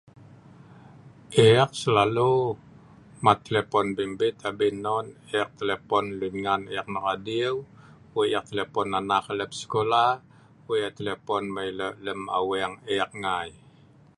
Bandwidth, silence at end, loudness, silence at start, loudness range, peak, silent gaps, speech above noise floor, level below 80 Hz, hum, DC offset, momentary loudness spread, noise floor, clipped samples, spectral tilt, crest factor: 11.5 kHz; 0.65 s; -26 LUFS; 0.2 s; 6 LU; -2 dBFS; none; 29 dB; -60 dBFS; none; under 0.1%; 10 LU; -54 dBFS; under 0.1%; -5.5 dB/octave; 24 dB